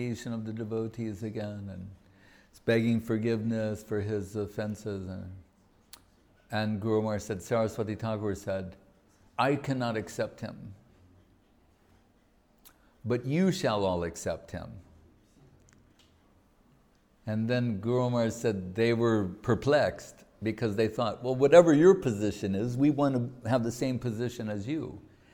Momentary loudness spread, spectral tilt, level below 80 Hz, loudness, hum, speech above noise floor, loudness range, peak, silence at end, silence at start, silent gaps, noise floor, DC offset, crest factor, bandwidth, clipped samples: 16 LU; -6.5 dB/octave; -60 dBFS; -29 LUFS; none; 36 dB; 12 LU; -6 dBFS; 0.35 s; 0 s; none; -65 dBFS; under 0.1%; 24 dB; 18.5 kHz; under 0.1%